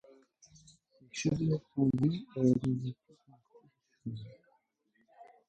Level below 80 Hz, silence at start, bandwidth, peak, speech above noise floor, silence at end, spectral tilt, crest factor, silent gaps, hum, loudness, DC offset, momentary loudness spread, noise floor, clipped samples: -64 dBFS; 1.15 s; 9 kHz; -16 dBFS; 44 dB; 0.25 s; -7 dB/octave; 20 dB; none; none; -33 LUFS; under 0.1%; 18 LU; -75 dBFS; under 0.1%